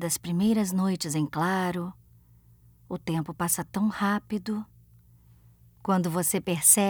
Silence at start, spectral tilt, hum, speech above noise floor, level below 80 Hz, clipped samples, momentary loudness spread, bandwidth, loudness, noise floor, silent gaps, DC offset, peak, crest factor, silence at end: 0 s; -4 dB/octave; none; 30 dB; -60 dBFS; under 0.1%; 11 LU; over 20 kHz; -27 LUFS; -57 dBFS; none; under 0.1%; -6 dBFS; 22 dB; 0 s